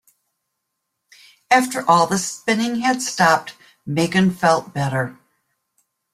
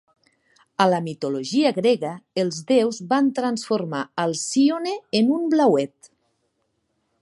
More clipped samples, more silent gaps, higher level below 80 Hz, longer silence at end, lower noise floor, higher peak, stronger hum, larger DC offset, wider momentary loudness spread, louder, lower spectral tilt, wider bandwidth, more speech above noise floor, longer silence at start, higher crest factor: neither; neither; first, -60 dBFS vs -72 dBFS; second, 1 s vs 1.35 s; first, -77 dBFS vs -72 dBFS; about the same, -2 dBFS vs -4 dBFS; neither; neither; about the same, 9 LU vs 8 LU; first, -19 LUFS vs -22 LUFS; about the same, -4.5 dB/octave vs -5 dB/octave; first, 15.5 kHz vs 11.5 kHz; first, 59 dB vs 51 dB; first, 1.5 s vs 0.8 s; about the same, 20 dB vs 18 dB